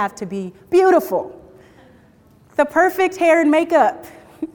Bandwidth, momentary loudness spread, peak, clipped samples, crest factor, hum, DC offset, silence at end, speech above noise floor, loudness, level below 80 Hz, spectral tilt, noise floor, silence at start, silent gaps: 19.5 kHz; 15 LU; -2 dBFS; under 0.1%; 16 dB; none; under 0.1%; 0.1 s; 34 dB; -17 LUFS; -58 dBFS; -5 dB/octave; -51 dBFS; 0 s; none